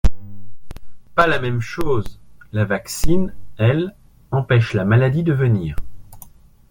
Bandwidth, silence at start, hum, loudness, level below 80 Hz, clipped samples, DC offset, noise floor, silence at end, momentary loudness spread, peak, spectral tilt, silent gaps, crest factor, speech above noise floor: 17 kHz; 0.05 s; none; -20 LUFS; -32 dBFS; under 0.1%; under 0.1%; -44 dBFS; 0.4 s; 12 LU; 0 dBFS; -6.5 dB/octave; none; 16 dB; 28 dB